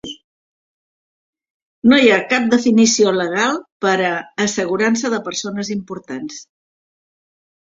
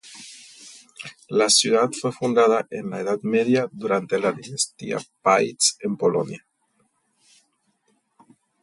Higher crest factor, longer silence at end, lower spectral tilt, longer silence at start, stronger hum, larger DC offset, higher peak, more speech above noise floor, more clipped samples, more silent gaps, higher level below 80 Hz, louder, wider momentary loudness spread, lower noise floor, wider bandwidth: about the same, 18 dB vs 18 dB; second, 1.3 s vs 2.25 s; about the same, -3.5 dB/octave vs -3 dB/octave; about the same, 0.05 s vs 0.05 s; neither; neither; first, 0 dBFS vs -6 dBFS; first, over 74 dB vs 46 dB; neither; first, 0.24-1.33 s, 1.50-1.82 s, 3.72-3.80 s vs none; first, -60 dBFS vs -70 dBFS; first, -16 LUFS vs -21 LUFS; second, 16 LU vs 23 LU; first, under -90 dBFS vs -68 dBFS; second, 7.8 kHz vs 11.5 kHz